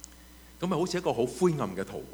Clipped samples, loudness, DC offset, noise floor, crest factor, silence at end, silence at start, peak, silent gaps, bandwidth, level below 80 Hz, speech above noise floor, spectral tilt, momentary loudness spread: under 0.1%; -30 LUFS; under 0.1%; -52 dBFS; 18 dB; 0 s; 0 s; -12 dBFS; none; over 20 kHz; -56 dBFS; 23 dB; -6 dB/octave; 10 LU